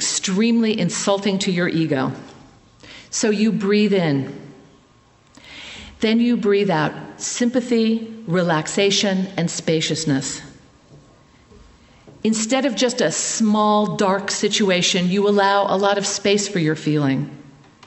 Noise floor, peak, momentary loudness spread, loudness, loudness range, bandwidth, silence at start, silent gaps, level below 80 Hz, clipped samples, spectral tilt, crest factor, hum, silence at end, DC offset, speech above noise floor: -53 dBFS; -2 dBFS; 9 LU; -19 LUFS; 5 LU; 8.4 kHz; 0 s; none; -58 dBFS; under 0.1%; -4 dB/octave; 18 dB; none; 0.4 s; under 0.1%; 35 dB